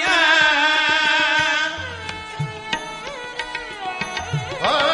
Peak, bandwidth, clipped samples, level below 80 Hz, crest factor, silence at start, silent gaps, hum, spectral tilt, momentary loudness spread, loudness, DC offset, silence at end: -4 dBFS; 11 kHz; under 0.1%; -52 dBFS; 16 dB; 0 s; none; none; -2.5 dB/octave; 15 LU; -19 LUFS; under 0.1%; 0 s